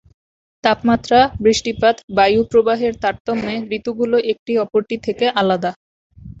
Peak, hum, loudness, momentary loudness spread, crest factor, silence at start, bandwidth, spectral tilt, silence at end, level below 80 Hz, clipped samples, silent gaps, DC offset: 0 dBFS; none; -17 LUFS; 8 LU; 18 dB; 0.65 s; 8 kHz; -4.5 dB/octave; 0.1 s; -46 dBFS; under 0.1%; 2.04-2.08 s, 3.20-3.25 s, 4.39-4.46 s, 5.76-6.10 s; under 0.1%